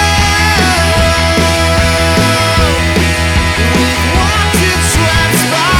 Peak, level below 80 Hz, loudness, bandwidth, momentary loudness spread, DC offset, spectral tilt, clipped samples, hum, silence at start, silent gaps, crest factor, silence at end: 0 dBFS; -18 dBFS; -10 LUFS; 18.5 kHz; 2 LU; under 0.1%; -4 dB/octave; under 0.1%; none; 0 s; none; 10 dB; 0 s